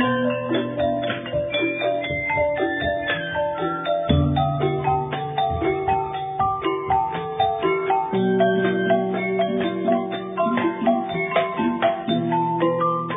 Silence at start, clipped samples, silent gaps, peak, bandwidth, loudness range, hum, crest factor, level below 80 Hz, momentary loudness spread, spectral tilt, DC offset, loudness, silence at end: 0 s; under 0.1%; none; -6 dBFS; 3.9 kHz; 2 LU; none; 16 dB; -44 dBFS; 4 LU; -10 dB/octave; under 0.1%; -22 LUFS; 0 s